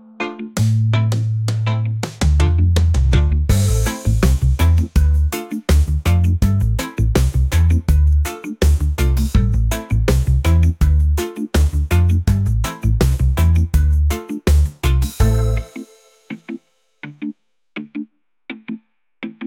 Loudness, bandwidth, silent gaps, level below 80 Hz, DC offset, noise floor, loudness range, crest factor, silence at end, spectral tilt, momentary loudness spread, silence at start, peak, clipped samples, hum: -17 LUFS; 16.5 kHz; none; -20 dBFS; under 0.1%; -41 dBFS; 6 LU; 14 dB; 0 s; -6.5 dB/octave; 16 LU; 0.2 s; -2 dBFS; under 0.1%; none